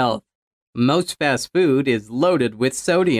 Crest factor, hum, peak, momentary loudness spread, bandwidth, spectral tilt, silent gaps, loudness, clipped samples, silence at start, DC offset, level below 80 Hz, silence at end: 14 dB; none; -4 dBFS; 5 LU; 15 kHz; -5 dB/octave; 0.35-0.73 s; -19 LUFS; under 0.1%; 0 s; under 0.1%; -58 dBFS; 0 s